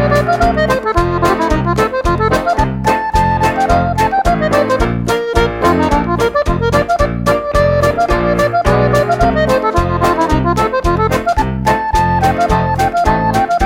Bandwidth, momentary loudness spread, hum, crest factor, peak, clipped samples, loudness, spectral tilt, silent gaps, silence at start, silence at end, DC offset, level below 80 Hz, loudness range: 17 kHz; 2 LU; none; 12 dB; 0 dBFS; under 0.1%; -13 LUFS; -6.5 dB/octave; none; 0 s; 0 s; under 0.1%; -24 dBFS; 1 LU